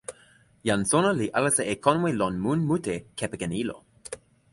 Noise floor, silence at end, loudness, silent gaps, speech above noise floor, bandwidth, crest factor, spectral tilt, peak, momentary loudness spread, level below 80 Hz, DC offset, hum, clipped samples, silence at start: -58 dBFS; 0.35 s; -26 LUFS; none; 33 dB; 11.5 kHz; 22 dB; -4.5 dB/octave; -6 dBFS; 18 LU; -56 dBFS; under 0.1%; none; under 0.1%; 0.1 s